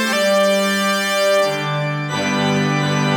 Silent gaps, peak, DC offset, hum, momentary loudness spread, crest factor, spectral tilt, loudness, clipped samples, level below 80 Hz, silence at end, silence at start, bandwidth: none; -6 dBFS; under 0.1%; none; 5 LU; 12 dB; -4.5 dB/octave; -17 LUFS; under 0.1%; -66 dBFS; 0 s; 0 s; over 20 kHz